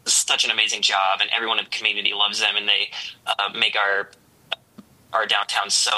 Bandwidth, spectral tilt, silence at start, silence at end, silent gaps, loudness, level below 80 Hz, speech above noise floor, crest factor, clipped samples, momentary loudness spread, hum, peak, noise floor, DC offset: 15.5 kHz; 1.5 dB/octave; 0.05 s; 0 s; none; -20 LUFS; -74 dBFS; 27 dB; 20 dB; under 0.1%; 12 LU; none; -4 dBFS; -49 dBFS; under 0.1%